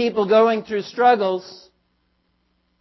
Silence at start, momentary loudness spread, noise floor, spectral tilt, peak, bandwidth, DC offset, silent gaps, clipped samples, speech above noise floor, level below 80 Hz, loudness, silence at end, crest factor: 0 s; 10 LU; -67 dBFS; -6 dB/octave; -4 dBFS; 6 kHz; under 0.1%; none; under 0.1%; 49 dB; -66 dBFS; -18 LUFS; 1.25 s; 16 dB